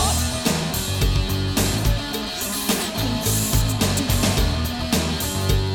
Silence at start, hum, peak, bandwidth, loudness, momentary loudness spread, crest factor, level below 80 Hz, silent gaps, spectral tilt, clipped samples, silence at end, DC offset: 0 s; none; -8 dBFS; over 20 kHz; -21 LUFS; 4 LU; 14 dB; -28 dBFS; none; -4 dB/octave; under 0.1%; 0 s; under 0.1%